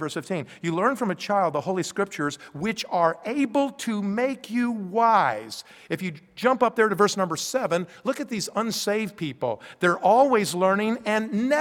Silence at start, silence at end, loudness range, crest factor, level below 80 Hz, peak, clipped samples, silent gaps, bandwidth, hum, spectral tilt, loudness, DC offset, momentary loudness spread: 0 s; 0 s; 3 LU; 18 dB; -68 dBFS; -6 dBFS; under 0.1%; none; 18 kHz; none; -4.5 dB/octave; -24 LUFS; under 0.1%; 10 LU